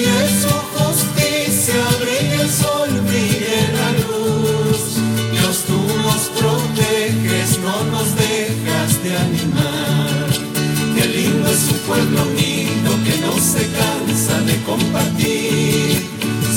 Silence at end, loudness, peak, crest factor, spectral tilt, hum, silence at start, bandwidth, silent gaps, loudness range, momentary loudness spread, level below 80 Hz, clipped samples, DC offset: 0 s; -16 LUFS; -2 dBFS; 14 dB; -4 dB/octave; none; 0 s; 17.5 kHz; none; 1 LU; 3 LU; -44 dBFS; under 0.1%; under 0.1%